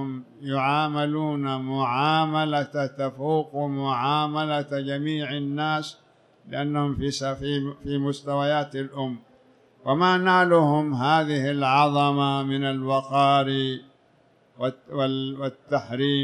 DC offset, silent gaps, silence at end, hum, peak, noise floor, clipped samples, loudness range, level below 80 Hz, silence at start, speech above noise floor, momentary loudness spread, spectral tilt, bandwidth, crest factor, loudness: under 0.1%; none; 0 s; none; -8 dBFS; -60 dBFS; under 0.1%; 7 LU; -58 dBFS; 0 s; 36 dB; 11 LU; -6.5 dB/octave; 10.5 kHz; 16 dB; -24 LUFS